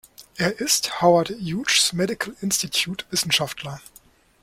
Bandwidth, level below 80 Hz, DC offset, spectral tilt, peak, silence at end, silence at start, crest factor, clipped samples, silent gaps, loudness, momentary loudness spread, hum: 16.5 kHz; -58 dBFS; under 0.1%; -2.5 dB/octave; -4 dBFS; 0.65 s; 0.2 s; 20 dB; under 0.1%; none; -21 LUFS; 13 LU; none